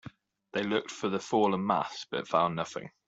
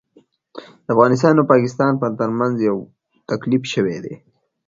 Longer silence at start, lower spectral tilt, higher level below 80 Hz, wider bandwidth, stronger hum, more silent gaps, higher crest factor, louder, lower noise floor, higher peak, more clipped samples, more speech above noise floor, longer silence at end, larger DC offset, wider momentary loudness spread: second, 0.05 s vs 0.55 s; second, -5 dB/octave vs -7 dB/octave; second, -72 dBFS vs -60 dBFS; about the same, 8 kHz vs 7.6 kHz; neither; neither; about the same, 20 dB vs 18 dB; second, -31 LUFS vs -18 LUFS; second, -51 dBFS vs -56 dBFS; second, -10 dBFS vs 0 dBFS; neither; second, 21 dB vs 39 dB; second, 0.2 s vs 0.55 s; neither; second, 9 LU vs 16 LU